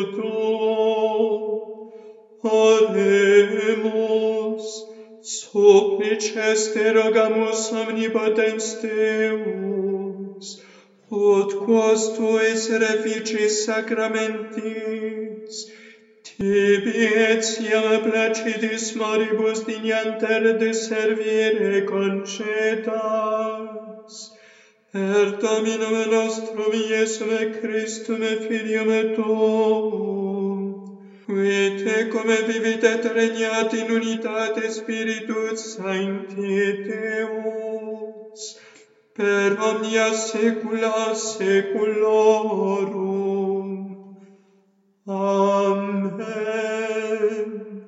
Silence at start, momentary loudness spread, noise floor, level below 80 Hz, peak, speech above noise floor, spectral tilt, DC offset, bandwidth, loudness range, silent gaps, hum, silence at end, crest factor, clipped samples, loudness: 0 s; 13 LU; -62 dBFS; -74 dBFS; -2 dBFS; 41 dB; -4 dB/octave; under 0.1%; 8 kHz; 6 LU; none; none; 0 s; 20 dB; under 0.1%; -21 LUFS